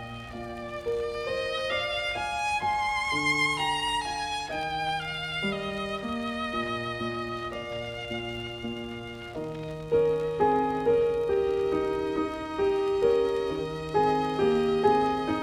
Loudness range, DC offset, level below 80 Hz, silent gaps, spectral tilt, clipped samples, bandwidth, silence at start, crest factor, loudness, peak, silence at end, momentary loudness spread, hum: 6 LU; under 0.1%; -52 dBFS; none; -4.5 dB/octave; under 0.1%; 13.5 kHz; 0 s; 18 dB; -28 LUFS; -10 dBFS; 0 s; 11 LU; none